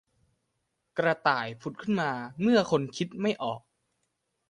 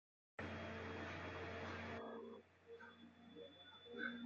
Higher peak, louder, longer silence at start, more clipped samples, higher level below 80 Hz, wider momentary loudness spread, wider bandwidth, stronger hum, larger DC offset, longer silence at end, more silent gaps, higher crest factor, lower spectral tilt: first, -10 dBFS vs -34 dBFS; first, -29 LUFS vs -52 LUFS; first, 0.95 s vs 0.4 s; neither; first, -70 dBFS vs -84 dBFS; about the same, 12 LU vs 12 LU; first, 10.5 kHz vs 7.4 kHz; neither; neither; first, 0.9 s vs 0 s; neither; about the same, 20 dB vs 18 dB; first, -5.5 dB/octave vs -3.5 dB/octave